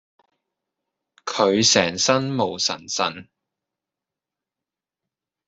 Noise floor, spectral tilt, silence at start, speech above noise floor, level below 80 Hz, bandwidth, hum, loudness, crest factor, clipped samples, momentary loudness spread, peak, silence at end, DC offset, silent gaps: -88 dBFS; -2.5 dB/octave; 1.25 s; 68 dB; -64 dBFS; 8.4 kHz; none; -20 LUFS; 24 dB; under 0.1%; 13 LU; -2 dBFS; 2.25 s; under 0.1%; none